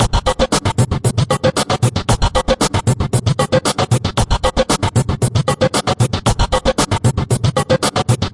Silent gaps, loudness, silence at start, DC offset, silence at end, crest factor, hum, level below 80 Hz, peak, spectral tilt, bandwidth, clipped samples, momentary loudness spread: none; -16 LUFS; 0 s; 0.2%; 0.05 s; 12 dB; none; -26 dBFS; -2 dBFS; -5 dB/octave; 11.5 kHz; under 0.1%; 2 LU